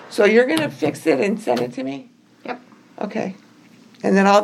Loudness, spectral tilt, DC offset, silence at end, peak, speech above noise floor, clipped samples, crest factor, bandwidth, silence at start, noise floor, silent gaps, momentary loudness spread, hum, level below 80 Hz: -19 LUFS; -5.5 dB/octave; under 0.1%; 0 s; -2 dBFS; 31 dB; under 0.1%; 18 dB; 14 kHz; 0 s; -48 dBFS; none; 19 LU; none; -74 dBFS